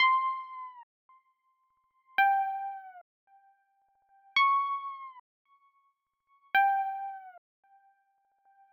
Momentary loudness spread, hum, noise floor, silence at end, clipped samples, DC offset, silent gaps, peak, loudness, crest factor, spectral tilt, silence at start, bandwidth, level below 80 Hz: 21 LU; none; -75 dBFS; 1.35 s; under 0.1%; under 0.1%; 0.83-1.09 s, 3.01-3.27 s, 5.20-5.45 s; -16 dBFS; -29 LUFS; 18 dB; 0.5 dB/octave; 0 s; 16 kHz; under -90 dBFS